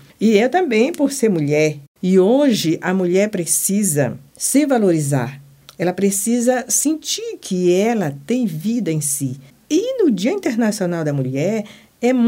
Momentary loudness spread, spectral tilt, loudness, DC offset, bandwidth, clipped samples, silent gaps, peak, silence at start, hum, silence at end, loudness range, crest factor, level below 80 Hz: 7 LU; -5 dB/octave; -18 LUFS; under 0.1%; 16.5 kHz; under 0.1%; 1.88-1.95 s; -2 dBFS; 0.2 s; none; 0 s; 3 LU; 16 dB; -64 dBFS